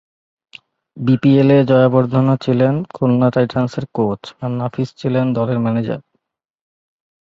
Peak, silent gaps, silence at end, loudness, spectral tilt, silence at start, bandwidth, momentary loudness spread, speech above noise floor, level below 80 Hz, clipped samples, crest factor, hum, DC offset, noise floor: -2 dBFS; none; 1.2 s; -16 LUFS; -9 dB/octave; 0.95 s; 7.4 kHz; 11 LU; 55 dB; -54 dBFS; under 0.1%; 16 dB; none; under 0.1%; -70 dBFS